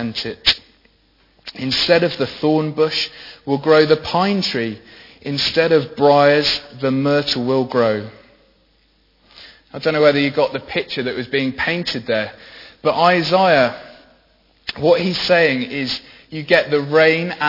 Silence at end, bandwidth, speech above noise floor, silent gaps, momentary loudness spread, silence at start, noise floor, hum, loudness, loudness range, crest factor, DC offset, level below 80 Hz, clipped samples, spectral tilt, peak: 0 s; 5.8 kHz; 41 dB; none; 13 LU; 0 s; -58 dBFS; none; -17 LUFS; 4 LU; 18 dB; under 0.1%; -52 dBFS; under 0.1%; -5.5 dB/octave; 0 dBFS